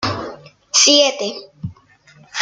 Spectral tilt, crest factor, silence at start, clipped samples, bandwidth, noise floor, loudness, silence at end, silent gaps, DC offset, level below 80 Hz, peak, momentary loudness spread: -1.5 dB/octave; 20 dB; 0 s; under 0.1%; 11 kHz; -49 dBFS; -13 LUFS; 0 s; none; under 0.1%; -56 dBFS; 0 dBFS; 23 LU